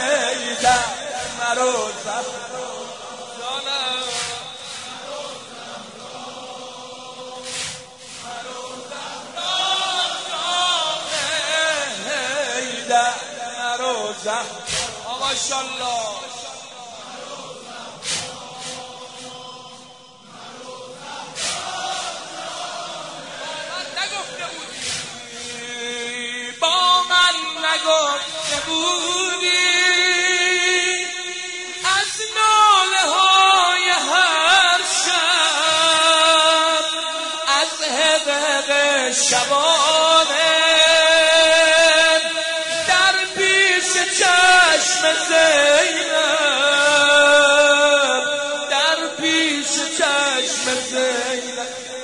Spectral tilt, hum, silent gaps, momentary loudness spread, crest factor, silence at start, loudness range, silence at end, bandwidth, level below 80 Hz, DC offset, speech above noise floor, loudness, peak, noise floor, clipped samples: 0.5 dB/octave; none; none; 20 LU; 16 dB; 0 s; 17 LU; 0 s; 11 kHz; -60 dBFS; 0.1%; 25 dB; -16 LUFS; -2 dBFS; -44 dBFS; under 0.1%